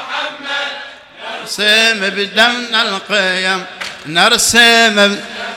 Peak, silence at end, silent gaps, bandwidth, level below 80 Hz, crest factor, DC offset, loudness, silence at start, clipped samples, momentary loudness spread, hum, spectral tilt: 0 dBFS; 0 s; none; over 20 kHz; -52 dBFS; 14 dB; under 0.1%; -11 LUFS; 0 s; 0.1%; 18 LU; none; -1.5 dB/octave